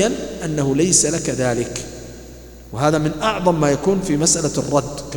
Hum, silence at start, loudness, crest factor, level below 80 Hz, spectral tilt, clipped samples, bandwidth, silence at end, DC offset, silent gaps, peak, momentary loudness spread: none; 0 s; -18 LUFS; 18 dB; -42 dBFS; -4 dB/octave; under 0.1%; 18 kHz; 0 s; under 0.1%; none; 0 dBFS; 17 LU